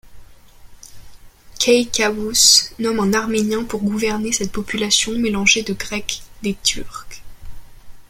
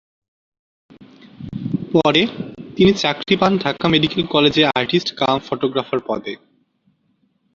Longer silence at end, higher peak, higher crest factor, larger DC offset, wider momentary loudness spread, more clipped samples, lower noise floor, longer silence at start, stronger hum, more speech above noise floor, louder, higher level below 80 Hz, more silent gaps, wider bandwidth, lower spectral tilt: second, 0.05 s vs 1.2 s; about the same, 0 dBFS vs -2 dBFS; about the same, 20 dB vs 18 dB; neither; second, 13 LU vs 16 LU; neither; second, -42 dBFS vs -64 dBFS; second, 0.05 s vs 1 s; neither; second, 23 dB vs 47 dB; about the same, -17 LUFS vs -17 LUFS; first, -42 dBFS vs -50 dBFS; neither; first, 16.5 kHz vs 7.6 kHz; second, -2 dB/octave vs -5.5 dB/octave